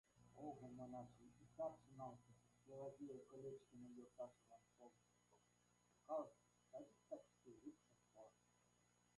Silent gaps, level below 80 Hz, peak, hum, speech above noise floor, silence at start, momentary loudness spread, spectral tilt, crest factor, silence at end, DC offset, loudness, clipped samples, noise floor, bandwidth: none; -88 dBFS; -38 dBFS; 60 Hz at -80 dBFS; 25 dB; 0.15 s; 15 LU; -7 dB/octave; 22 dB; 0.8 s; under 0.1%; -58 LUFS; under 0.1%; -81 dBFS; 11 kHz